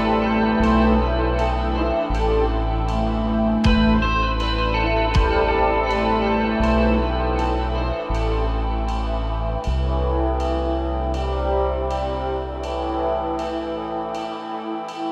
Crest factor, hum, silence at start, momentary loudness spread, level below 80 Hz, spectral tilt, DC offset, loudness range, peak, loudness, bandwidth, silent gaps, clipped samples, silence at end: 14 dB; none; 0 s; 8 LU; -24 dBFS; -7.5 dB/octave; under 0.1%; 5 LU; -6 dBFS; -21 LUFS; 7.8 kHz; none; under 0.1%; 0 s